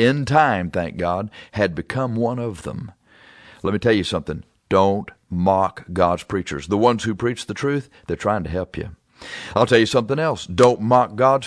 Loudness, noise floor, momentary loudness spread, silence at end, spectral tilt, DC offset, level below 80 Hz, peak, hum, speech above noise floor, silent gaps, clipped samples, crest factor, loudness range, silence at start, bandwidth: -20 LUFS; -48 dBFS; 15 LU; 0 s; -6 dB/octave; under 0.1%; -46 dBFS; -2 dBFS; none; 29 dB; none; under 0.1%; 20 dB; 4 LU; 0 s; 11 kHz